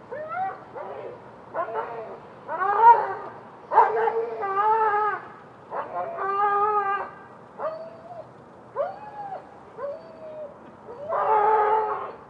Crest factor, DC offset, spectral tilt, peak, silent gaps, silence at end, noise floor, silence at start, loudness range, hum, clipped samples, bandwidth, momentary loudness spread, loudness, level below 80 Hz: 22 dB; under 0.1%; -6.5 dB/octave; -4 dBFS; none; 0 s; -47 dBFS; 0 s; 14 LU; none; under 0.1%; 5.4 kHz; 21 LU; -24 LUFS; -72 dBFS